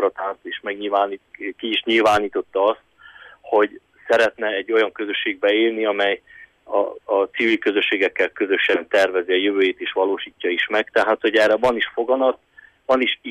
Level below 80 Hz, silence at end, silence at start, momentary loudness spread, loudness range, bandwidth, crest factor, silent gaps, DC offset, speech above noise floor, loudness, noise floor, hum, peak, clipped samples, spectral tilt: -62 dBFS; 0 s; 0 s; 8 LU; 2 LU; 13 kHz; 14 dB; none; under 0.1%; 25 dB; -20 LUFS; -45 dBFS; none; -6 dBFS; under 0.1%; -3.5 dB/octave